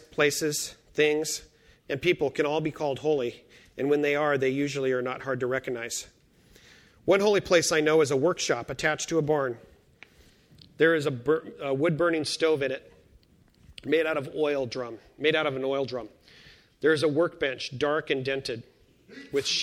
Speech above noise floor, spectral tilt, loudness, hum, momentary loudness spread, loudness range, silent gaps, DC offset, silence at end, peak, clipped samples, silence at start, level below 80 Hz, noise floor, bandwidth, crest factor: 33 dB; -4 dB/octave; -27 LUFS; none; 12 LU; 4 LU; none; under 0.1%; 0 s; -8 dBFS; under 0.1%; 0.2 s; -62 dBFS; -60 dBFS; 15.5 kHz; 20 dB